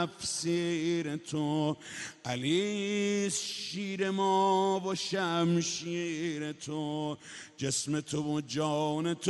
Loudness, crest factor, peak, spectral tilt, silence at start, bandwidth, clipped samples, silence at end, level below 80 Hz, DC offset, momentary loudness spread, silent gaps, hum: -32 LUFS; 16 dB; -16 dBFS; -4.5 dB/octave; 0 s; 11.5 kHz; under 0.1%; 0 s; -72 dBFS; under 0.1%; 9 LU; none; none